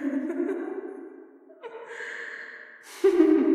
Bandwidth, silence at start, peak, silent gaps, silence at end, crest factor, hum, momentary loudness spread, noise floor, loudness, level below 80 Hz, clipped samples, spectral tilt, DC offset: 13 kHz; 0 s; -8 dBFS; none; 0 s; 20 dB; none; 23 LU; -49 dBFS; -27 LUFS; -72 dBFS; under 0.1%; -4.5 dB/octave; under 0.1%